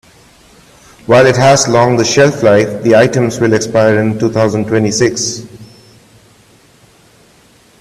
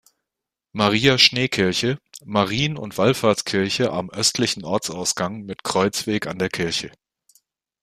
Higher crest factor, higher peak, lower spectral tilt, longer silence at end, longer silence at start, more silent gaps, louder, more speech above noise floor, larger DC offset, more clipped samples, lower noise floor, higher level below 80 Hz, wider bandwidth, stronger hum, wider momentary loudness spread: second, 12 dB vs 22 dB; about the same, 0 dBFS vs 0 dBFS; first, -5 dB/octave vs -3.5 dB/octave; first, 2.15 s vs 0.95 s; first, 1.1 s vs 0.75 s; neither; first, -10 LUFS vs -20 LUFS; second, 36 dB vs 64 dB; neither; neither; second, -46 dBFS vs -86 dBFS; first, -46 dBFS vs -56 dBFS; second, 13.5 kHz vs 15.5 kHz; neither; second, 5 LU vs 10 LU